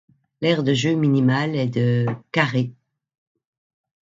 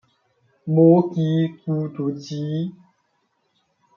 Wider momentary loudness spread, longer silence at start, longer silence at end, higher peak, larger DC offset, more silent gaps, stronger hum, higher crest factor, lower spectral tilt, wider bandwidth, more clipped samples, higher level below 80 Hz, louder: second, 6 LU vs 14 LU; second, 0.4 s vs 0.65 s; first, 1.45 s vs 1.25 s; about the same, -2 dBFS vs -4 dBFS; neither; neither; neither; about the same, 20 dB vs 18 dB; second, -6.5 dB/octave vs -9.5 dB/octave; first, 7.8 kHz vs 6.8 kHz; neither; first, -62 dBFS vs -70 dBFS; about the same, -21 LUFS vs -21 LUFS